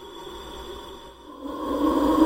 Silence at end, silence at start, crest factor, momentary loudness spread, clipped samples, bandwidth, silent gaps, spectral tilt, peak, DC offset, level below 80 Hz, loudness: 0 s; 0 s; 20 dB; 20 LU; under 0.1%; 16 kHz; none; -5.5 dB/octave; -6 dBFS; under 0.1%; -46 dBFS; -27 LUFS